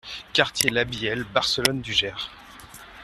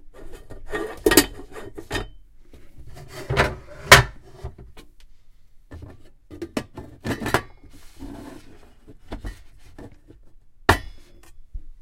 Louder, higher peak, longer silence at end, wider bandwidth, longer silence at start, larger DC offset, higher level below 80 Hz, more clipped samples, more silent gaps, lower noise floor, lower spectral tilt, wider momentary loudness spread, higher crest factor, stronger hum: second, -23 LUFS vs -20 LUFS; about the same, 0 dBFS vs 0 dBFS; about the same, 0 s vs 0.05 s; second, 14.5 kHz vs 16.5 kHz; about the same, 0.05 s vs 0.05 s; neither; second, -52 dBFS vs -38 dBFS; neither; neither; about the same, -45 dBFS vs -46 dBFS; about the same, -2.5 dB/octave vs -3 dB/octave; second, 18 LU vs 28 LU; about the same, 26 dB vs 26 dB; neither